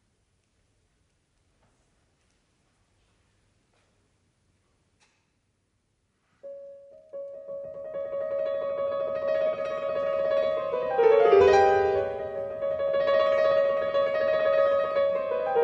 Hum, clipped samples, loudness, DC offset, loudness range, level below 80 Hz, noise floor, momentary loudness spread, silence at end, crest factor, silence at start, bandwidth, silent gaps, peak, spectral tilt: none; under 0.1%; -25 LUFS; under 0.1%; 18 LU; -62 dBFS; -73 dBFS; 20 LU; 0 s; 20 dB; 6.45 s; 7.2 kHz; none; -8 dBFS; -5 dB/octave